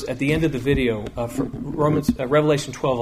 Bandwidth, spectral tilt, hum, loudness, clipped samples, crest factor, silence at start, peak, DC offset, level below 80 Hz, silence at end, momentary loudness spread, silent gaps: 15.5 kHz; -6.5 dB/octave; none; -22 LUFS; under 0.1%; 16 dB; 0 s; -6 dBFS; under 0.1%; -38 dBFS; 0 s; 8 LU; none